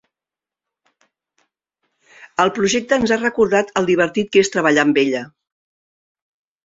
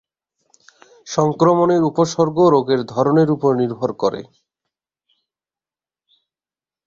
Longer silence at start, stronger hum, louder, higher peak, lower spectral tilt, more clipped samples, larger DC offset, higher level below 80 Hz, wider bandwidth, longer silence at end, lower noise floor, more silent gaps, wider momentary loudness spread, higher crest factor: first, 2.2 s vs 1.05 s; neither; about the same, -17 LUFS vs -17 LUFS; about the same, -2 dBFS vs -2 dBFS; second, -4 dB/octave vs -7 dB/octave; neither; neither; about the same, -56 dBFS vs -60 dBFS; about the same, 8 kHz vs 7.6 kHz; second, 1.4 s vs 2.6 s; about the same, -89 dBFS vs under -90 dBFS; neither; about the same, 6 LU vs 8 LU; about the same, 18 dB vs 18 dB